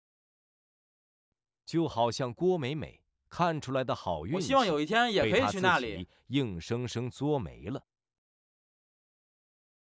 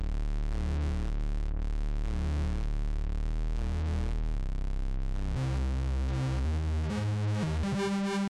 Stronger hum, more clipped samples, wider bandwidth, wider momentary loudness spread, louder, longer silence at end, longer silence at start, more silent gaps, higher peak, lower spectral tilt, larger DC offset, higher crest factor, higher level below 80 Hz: neither; neither; second, 8 kHz vs 10.5 kHz; first, 13 LU vs 5 LU; first, -30 LUFS vs -33 LUFS; first, 2.2 s vs 0 s; first, 1.7 s vs 0 s; neither; first, -12 dBFS vs -22 dBFS; second, -5.5 dB/octave vs -7 dB/octave; neither; first, 20 dB vs 6 dB; second, -58 dBFS vs -32 dBFS